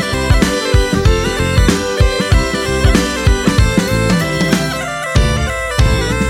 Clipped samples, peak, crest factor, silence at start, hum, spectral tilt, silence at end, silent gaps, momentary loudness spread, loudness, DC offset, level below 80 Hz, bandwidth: under 0.1%; 0 dBFS; 12 dB; 0 s; none; -5 dB/octave; 0 s; none; 3 LU; -14 LUFS; under 0.1%; -18 dBFS; 16 kHz